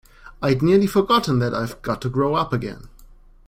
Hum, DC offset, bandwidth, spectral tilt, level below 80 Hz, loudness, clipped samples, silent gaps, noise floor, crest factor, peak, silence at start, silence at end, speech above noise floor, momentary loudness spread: none; under 0.1%; 16 kHz; -6.5 dB/octave; -44 dBFS; -20 LUFS; under 0.1%; none; -47 dBFS; 16 dB; -4 dBFS; 0.25 s; 0.45 s; 27 dB; 9 LU